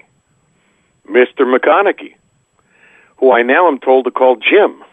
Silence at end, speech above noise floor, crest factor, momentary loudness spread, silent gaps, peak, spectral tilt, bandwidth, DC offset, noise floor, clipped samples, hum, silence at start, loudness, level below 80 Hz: 0.2 s; 47 dB; 14 dB; 5 LU; none; 0 dBFS; -5.5 dB/octave; 3.8 kHz; under 0.1%; -58 dBFS; under 0.1%; none; 1.1 s; -11 LUFS; -70 dBFS